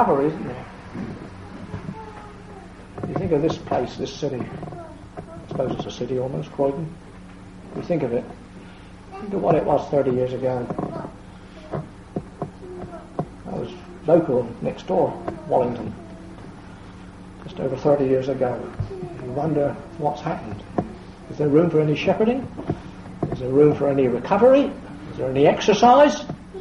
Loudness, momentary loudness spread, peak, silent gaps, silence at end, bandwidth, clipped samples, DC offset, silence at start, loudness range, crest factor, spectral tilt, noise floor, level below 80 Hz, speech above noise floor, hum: -22 LUFS; 23 LU; -4 dBFS; none; 0 s; 11 kHz; under 0.1%; under 0.1%; 0 s; 9 LU; 20 dB; -7 dB/octave; -41 dBFS; -46 dBFS; 21 dB; none